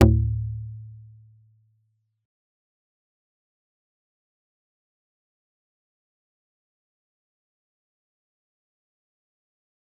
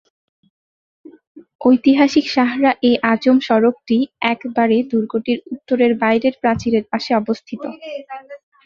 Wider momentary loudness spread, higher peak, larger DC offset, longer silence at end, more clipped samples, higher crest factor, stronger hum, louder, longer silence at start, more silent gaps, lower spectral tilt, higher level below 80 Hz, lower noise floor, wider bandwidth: first, 24 LU vs 15 LU; about the same, -2 dBFS vs -2 dBFS; neither; first, 9 s vs 0.3 s; neither; first, 30 dB vs 16 dB; neither; second, -26 LUFS vs -17 LUFS; second, 0 s vs 1.35 s; second, none vs 1.55-1.59 s; first, -8 dB/octave vs -6 dB/octave; first, -38 dBFS vs -54 dBFS; second, -71 dBFS vs under -90 dBFS; second, 0.7 kHz vs 7.2 kHz